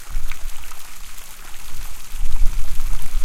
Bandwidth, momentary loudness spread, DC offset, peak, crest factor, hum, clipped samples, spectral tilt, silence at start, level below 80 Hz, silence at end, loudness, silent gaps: 14.5 kHz; 10 LU; under 0.1%; 0 dBFS; 14 dB; none; under 0.1%; -3 dB/octave; 0 s; -22 dBFS; 0 s; -33 LUFS; none